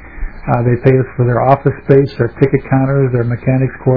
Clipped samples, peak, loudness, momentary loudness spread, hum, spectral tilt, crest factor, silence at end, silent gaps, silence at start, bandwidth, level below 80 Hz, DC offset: 0.4%; 0 dBFS; -13 LUFS; 5 LU; none; -11.5 dB/octave; 12 dB; 0 s; none; 0 s; 4.9 kHz; -32 dBFS; 1%